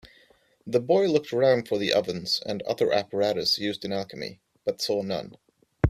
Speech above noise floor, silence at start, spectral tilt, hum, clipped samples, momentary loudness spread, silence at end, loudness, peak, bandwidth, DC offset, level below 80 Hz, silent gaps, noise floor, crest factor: 35 dB; 0.05 s; -5 dB/octave; none; under 0.1%; 11 LU; 0 s; -26 LUFS; -6 dBFS; 15 kHz; under 0.1%; -48 dBFS; none; -61 dBFS; 22 dB